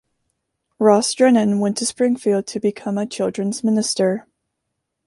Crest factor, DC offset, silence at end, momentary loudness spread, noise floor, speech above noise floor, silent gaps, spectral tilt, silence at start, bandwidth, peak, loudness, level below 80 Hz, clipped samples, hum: 18 dB; under 0.1%; 0.85 s; 8 LU; -77 dBFS; 59 dB; none; -4.5 dB/octave; 0.8 s; 11.5 kHz; -2 dBFS; -19 LUFS; -66 dBFS; under 0.1%; none